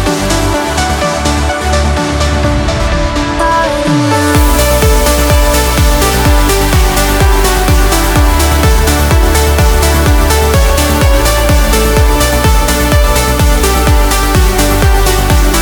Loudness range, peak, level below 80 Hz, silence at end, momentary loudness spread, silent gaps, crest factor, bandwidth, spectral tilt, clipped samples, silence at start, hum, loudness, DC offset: 2 LU; 0 dBFS; -12 dBFS; 0 s; 3 LU; none; 8 dB; over 20 kHz; -4.5 dB/octave; under 0.1%; 0 s; none; -10 LUFS; under 0.1%